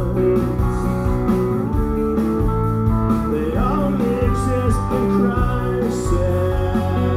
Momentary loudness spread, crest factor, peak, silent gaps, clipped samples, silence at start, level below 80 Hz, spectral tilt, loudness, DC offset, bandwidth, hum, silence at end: 3 LU; 12 dB; -4 dBFS; none; under 0.1%; 0 s; -26 dBFS; -8.5 dB/octave; -19 LUFS; 0.2%; 15 kHz; none; 0 s